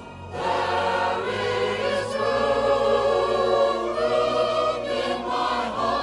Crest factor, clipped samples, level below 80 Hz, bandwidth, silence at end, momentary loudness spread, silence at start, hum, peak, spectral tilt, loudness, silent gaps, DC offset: 14 dB; under 0.1%; -50 dBFS; 11.5 kHz; 0 s; 5 LU; 0 s; none; -8 dBFS; -4.5 dB/octave; -23 LUFS; none; under 0.1%